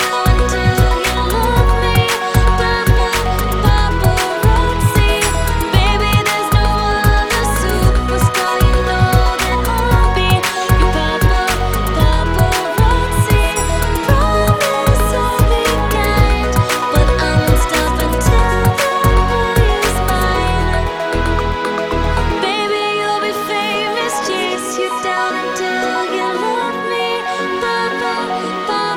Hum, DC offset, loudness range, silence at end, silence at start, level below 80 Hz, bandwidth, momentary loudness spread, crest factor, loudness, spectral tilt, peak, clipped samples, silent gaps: none; 0.2%; 3 LU; 0 s; 0 s; -18 dBFS; 18.5 kHz; 4 LU; 14 dB; -15 LUFS; -5 dB/octave; 0 dBFS; under 0.1%; none